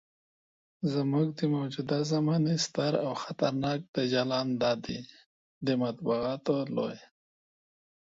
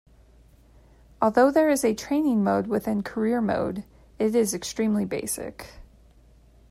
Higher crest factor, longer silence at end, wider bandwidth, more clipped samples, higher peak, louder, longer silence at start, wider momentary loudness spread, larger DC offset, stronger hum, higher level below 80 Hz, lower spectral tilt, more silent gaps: about the same, 18 dB vs 18 dB; first, 1.2 s vs 0.9 s; second, 8 kHz vs 16 kHz; neither; second, -14 dBFS vs -8 dBFS; second, -30 LUFS vs -24 LUFS; second, 0.8 s vs 1.2 s; second, 7 LU vs 12 LU; neither; neither; second, -66 dBFS vs -54 dBFS; about the same, -6 dB/octave vs -5 dB/octave; first, 3.88-3.94 s, 5.26-5.61 s vs none